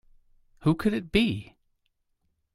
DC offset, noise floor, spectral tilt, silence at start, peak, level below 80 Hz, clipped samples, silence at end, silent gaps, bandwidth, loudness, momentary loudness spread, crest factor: under 0.1%; -75 dBFS; -7 dB/octave; 0.6 s; -8 dBFS; -48 dBFS; under 0.1%; 1.1 s; none; 15 kHz; -27 LUFS; 4 LU; 22 dB